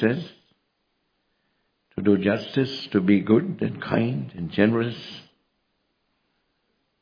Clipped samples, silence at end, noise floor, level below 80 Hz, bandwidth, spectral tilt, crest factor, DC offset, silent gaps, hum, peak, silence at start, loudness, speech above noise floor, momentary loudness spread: under 0.1%; 1.8 s; -73 dBFS; -64 dBFS; 5.2 kHz; -8.5 dB/octave; 22 dB; under 0.1%; none; none; -4 dBFS; 0 s; -23 LUFS; 51 dB; 17 LU